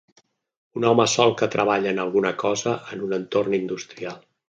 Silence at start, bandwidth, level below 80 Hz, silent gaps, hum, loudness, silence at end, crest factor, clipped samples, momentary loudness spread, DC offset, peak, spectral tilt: 0.75 s; 9.6 kHz; -66 dBFS; none; none; -22 LUFS; 0.3 s; 22 dB; under 0.1%; 14 LU; under 0.1%; -2 dBFS; -4 dB/octave